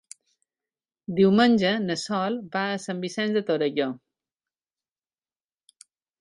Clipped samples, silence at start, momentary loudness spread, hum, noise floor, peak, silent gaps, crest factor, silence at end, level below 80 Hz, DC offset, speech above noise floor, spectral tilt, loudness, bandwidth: under 0.1%; 1.1 s; 12 LU; none; under -90 dBFS; -8 dBFS; none; 18 dB; 2.25 s; -68 dBFS; under 0.1%; over 67 dB; -5.5 dB/octave; -24 LUFS; 11.5 kHz